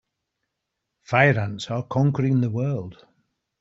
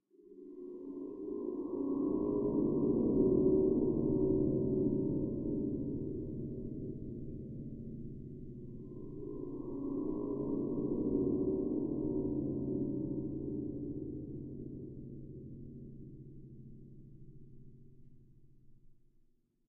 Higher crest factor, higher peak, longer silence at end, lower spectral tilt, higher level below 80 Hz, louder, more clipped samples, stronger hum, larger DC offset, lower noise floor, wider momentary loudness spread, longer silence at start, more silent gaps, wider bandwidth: about the same, 20 dB vs 20 dB; first, -4 dBFS vs -18 dBFS; about the same, 0.65 s vs 0.75 s; second, -7.5 dB/octave vs -16 dB/octave; second, -60 dBFS vs -54 dBFS; first, -22 LUFS vs -36 LUFS; neither; neither; neither; first, -81 dBFS vs -70 dBFS; second, 11 LU vs 19 LU; first, 1.1 s vs 0.2 s; neither; first, 7.8 kHz vs 1.2 kHz